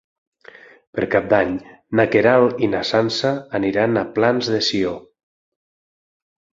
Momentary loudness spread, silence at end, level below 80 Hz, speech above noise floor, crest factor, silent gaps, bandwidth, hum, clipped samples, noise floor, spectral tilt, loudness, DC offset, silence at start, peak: 10 LU; 1.55 s; -54 dBFS; 27 dB; 20 dB; none; 7.8 kHz; none; under 0.1%; -45 dBFS; -5.5 dB/octave; -18 LUFS; under 0.1%; 0.95 s; 0 dBFS